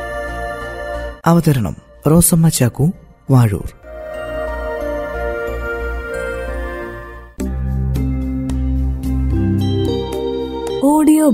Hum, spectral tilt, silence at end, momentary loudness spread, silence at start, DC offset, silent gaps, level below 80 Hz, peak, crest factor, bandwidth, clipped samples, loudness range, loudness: none; -6 dB/octave; 0 s; 13 LU; 0 s; under 0.1%; none; -26 dBFS; 0 dBFS; 16 dB; 16 kHz; under 0.1%; 8 LU; -18 LUFS